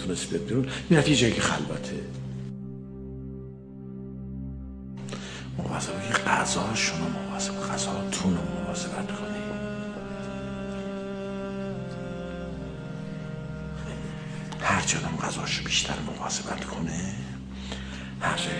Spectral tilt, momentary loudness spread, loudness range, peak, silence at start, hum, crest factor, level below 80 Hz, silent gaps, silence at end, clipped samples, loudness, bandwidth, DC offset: -4 dB/octave; 14 LU; 9 LU; -6 dBFS; 0 s; none; 24 dB; -46 dBFS; none; 0 s; under 0.1%; -30 LUFS; 10.5 kHz; under 0.1%